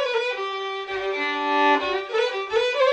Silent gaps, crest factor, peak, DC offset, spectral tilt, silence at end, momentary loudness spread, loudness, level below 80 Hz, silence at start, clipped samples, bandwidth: none; 14 dB; -8 dBFS; under 0.1%; -2 dB/octave; 0 s; 8 LU; -23 LUFS; -62 dBFS; 0 s; under 0.1%; 9.2 kHz